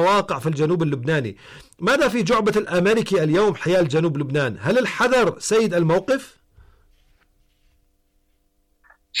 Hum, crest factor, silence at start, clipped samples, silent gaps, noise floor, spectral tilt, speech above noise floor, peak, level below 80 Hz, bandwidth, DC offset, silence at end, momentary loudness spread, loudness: none; 10 dB; 0 s; under 0.1%; none; -65 dBFS; -5.5 dB/octave; 45 dB; -10 dBFS; -52 dBFS; 15 kHz; under 0.1%; 0 s; 6 LU; -20 LUFS